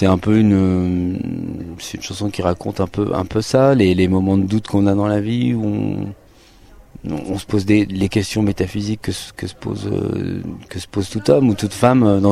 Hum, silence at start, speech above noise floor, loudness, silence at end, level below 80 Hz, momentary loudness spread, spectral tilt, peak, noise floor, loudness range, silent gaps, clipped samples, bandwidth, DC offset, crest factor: none; 0 s; 29 dB; -18 LUFS; 0 s; -44 dBFS; 14 LU; -7 dB/octave; 0 dBFS; -46 dBFS; 4 LU; none; under 0.1%; 14.5 kHz; under 0.1%; 16 dB